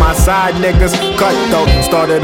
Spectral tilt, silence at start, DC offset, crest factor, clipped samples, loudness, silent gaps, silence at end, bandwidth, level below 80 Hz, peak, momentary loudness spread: -5 dB/octave; 0 s; under 0.1%; 10 dB; under 0.1%; -12 LUFS; none; 0 s; 17 kHz; -16 dBFS; 0 dBFS; 1 LU